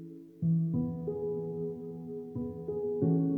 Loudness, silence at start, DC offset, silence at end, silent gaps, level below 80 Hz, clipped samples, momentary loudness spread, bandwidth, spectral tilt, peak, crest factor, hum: -34 LUFS; 0 s; under 0.1%; 0 s; none; -64 dBFS; under 0.1%; 12 LU; 1.6 kHz; -13.5 dB/octave; -18 dBFS; 16 dB; none